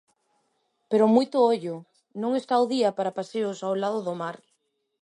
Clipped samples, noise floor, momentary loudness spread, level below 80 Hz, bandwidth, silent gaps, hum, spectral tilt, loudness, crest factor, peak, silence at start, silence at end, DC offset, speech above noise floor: under 0.1%; -74 dBFS; 14 LU; -78 dBFS; 11 kHz; none; none; -6 dB/octave; -25 LUFS; 18 dB; -8 dBFS; 0.9 s; 0.65 s; under 0.1%; 50 dB